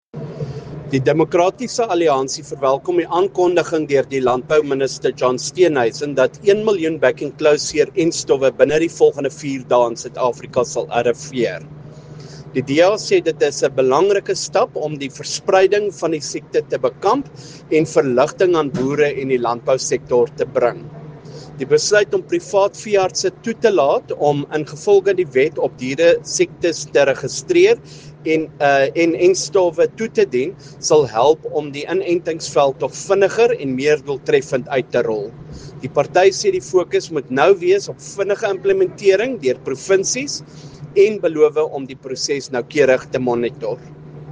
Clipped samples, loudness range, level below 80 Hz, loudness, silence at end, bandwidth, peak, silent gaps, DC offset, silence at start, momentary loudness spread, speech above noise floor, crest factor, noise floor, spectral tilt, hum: under 0.1%; 2 LU; -56 dBFS; -17 LUFS; 0 s; 10 kHz; 0 dBFS; none; under 0.1%; 0.15 s; 10 LU; 19 dB; 18 dB; -36 dBFS; -4.5 dB/octave; none